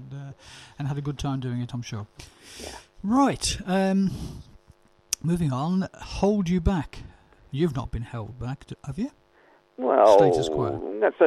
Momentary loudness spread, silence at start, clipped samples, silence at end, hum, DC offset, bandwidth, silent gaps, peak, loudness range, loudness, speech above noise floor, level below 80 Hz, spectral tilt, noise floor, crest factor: 19 LU; 0 s; under 0.1%; 0 s; none; under 0.1%; 14 kHz; none; -2 dBFS; 6 LU; -25 LUFS; 34 dB; -42 dBFS; -6 dB/octave; -59 dBFS; 24 dB